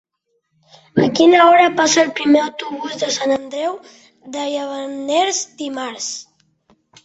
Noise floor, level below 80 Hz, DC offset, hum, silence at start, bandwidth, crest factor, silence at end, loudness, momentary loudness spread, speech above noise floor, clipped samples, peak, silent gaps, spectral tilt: -69 dBFS; -62 dBFS; under 0.1%; none; 0.95 s; 8.2 kHz; 16 dB; 0.8 s; -16 LUFS; 15 LU; 53 dB; under 0.1%; 0 dBFS; none; -3 dB/octave